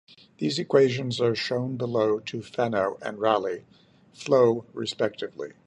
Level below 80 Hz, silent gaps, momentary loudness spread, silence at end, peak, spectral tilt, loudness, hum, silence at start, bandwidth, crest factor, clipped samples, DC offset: -68 dBFS; none; 12 LU; 0.15 s; -6 dBFS; -5.5 dB/octave; -26 LUFS; none; 0.4 s; 9.4 kHz; 20 dB; under 0.1%; under 0.1%